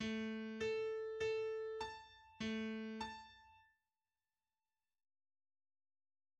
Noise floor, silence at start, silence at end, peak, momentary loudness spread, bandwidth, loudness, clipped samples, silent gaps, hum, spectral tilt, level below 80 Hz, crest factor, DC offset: under -90 dBFS; 0 s; 2.8 s; -32 dBFS; 15 LU; 10 kHz; -44 LUFS; under 0.1%; none; none; -5 dB/octave; -74 dBFS; 16 dB; under 0.1%